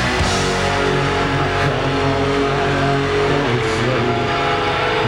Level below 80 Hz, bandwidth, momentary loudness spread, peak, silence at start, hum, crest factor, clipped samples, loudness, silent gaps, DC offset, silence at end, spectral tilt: -32 dBFS; 12.5 kHz; 1 LU; -6 dBFS; 0 s; none; 12 dB; under 0.1%; -17 LUFS; none; under 0.1%; 0 s; -5 dB/octave